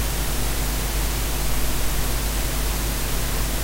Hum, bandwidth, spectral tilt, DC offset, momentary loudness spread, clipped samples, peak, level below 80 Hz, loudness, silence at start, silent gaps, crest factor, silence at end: none; 16 kHz; -3.5 dB/octave; under 0.1%; 0 LU; under 0.1%; -10 dBFS; -26 dBFS; -25 LUFS; 0 s; none; 12 dB; 0 s